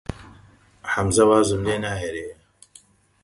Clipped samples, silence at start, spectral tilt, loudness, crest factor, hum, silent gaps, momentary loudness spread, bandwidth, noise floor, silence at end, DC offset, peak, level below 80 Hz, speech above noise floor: under 0.1%; 0.1 s; -5 dB/octave; -21 LUFS; 20 dB; none; none; 20 LU; 11.5 kHz; -53 dBFS; 0.9 s; under 0.1%; -4 dBFS; -44 dBFS; 33 dB